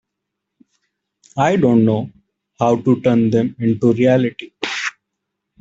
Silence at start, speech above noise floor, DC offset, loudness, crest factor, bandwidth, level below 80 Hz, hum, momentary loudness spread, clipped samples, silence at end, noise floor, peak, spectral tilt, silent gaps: 1.35 s; 64 dB; under 0.1%; -17 LUFS; 16 dB; 7.8 kHz; -56 dBFS; none; 11 LU; under 0.1%; 0.7 s; -79 dBFS; 0 dBFS; -7 dB/octave; none